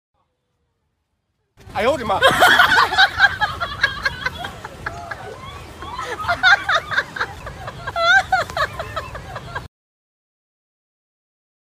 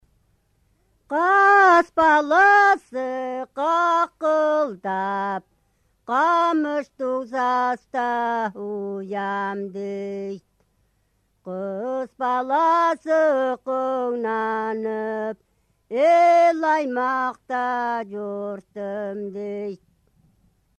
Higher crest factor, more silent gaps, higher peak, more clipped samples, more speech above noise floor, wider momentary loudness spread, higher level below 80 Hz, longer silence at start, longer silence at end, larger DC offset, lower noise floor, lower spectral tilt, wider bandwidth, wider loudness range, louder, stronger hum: about the same, 20 dB vs 16 dB; neither; first, 0 dBFS vs -6 dBFS; neither; first, 57 dB vs 46 dB; first, 20 LU vs 15 LU; first, -44 dBFS vs -66 dBFS; first, 1.65 s vs 1.1 s; first, 2.05 s vs 1.05 s; neither; first, -71 dBFS vs -67 dBFS; second, -2.5 dB/octave vs -5 dB/octave; first, 16 kHz vs 9.4 kHz; second, 7 LU vs 11 LU; first, -17 LUFS vs -21 LUFS; neither